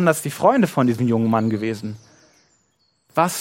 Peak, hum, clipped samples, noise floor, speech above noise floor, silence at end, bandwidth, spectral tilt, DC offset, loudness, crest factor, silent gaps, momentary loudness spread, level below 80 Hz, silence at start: -2 dBFS; none; under 0.1%; -66 dBFS; 47 dB; 0 s; 16.5 kHz; -6 dB/octave; under 0.1%; -20 LUFS; 18 dB; none; 13 LU; -62 dBFS; 0 s